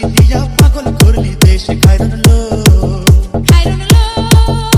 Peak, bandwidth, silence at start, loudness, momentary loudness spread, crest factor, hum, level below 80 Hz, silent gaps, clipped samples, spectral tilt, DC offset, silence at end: 0 dBFS; 17.5 kHz; 0 s; -9 LUFS; 1 LU; 8 dB; none; -12 dBFS; none; 6%; -5.5 dB/octave; under 0.1%; 0 s